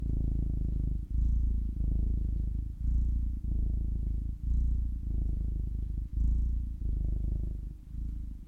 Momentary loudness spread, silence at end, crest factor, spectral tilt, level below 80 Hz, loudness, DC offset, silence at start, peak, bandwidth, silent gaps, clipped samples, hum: 5 LU; 0 s; 10 dB; -11 dB/octave; -32 dBFS; -35 LUFS; under 0.1%; 0 s; -20 dBFS; 0.8 kHz; none; under 0.1%; none